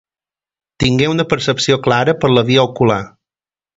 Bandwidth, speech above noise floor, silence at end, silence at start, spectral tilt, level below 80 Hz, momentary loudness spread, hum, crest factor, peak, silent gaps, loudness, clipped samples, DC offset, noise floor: 8 kHz; over 76 dB; 0.7 s; 0.8 s; -5.5 dB/octave; -42 dBFS; 5 LU; none; 16 dB; 0 dBFS; none; -14 LUFS; under 0.1%; under 0.1%; under -90 dBFS